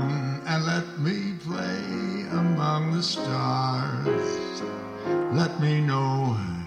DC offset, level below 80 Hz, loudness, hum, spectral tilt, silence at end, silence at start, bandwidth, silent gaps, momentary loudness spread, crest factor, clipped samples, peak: under 0.1%; -62 dBFS; -26 LUFS; none; -6.5 dB/octave; 0 s; 0 s; 9.4 kHz; none; 7 LU; 16 dB; under 0.1%; -10 dBFS